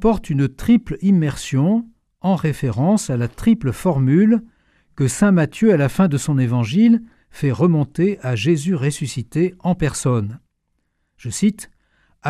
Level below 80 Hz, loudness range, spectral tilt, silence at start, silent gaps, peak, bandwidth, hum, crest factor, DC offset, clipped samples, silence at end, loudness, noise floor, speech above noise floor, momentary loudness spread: -42 dBFS; 5 LU; -7 dB/octave; 0 s; none; -2 dBFS; 14.5 kHz; none; 16 dB; under 0.1%; under 0.1%; 0 s; -18 LUFS; -70 dBFS; 53 dB; 7 LU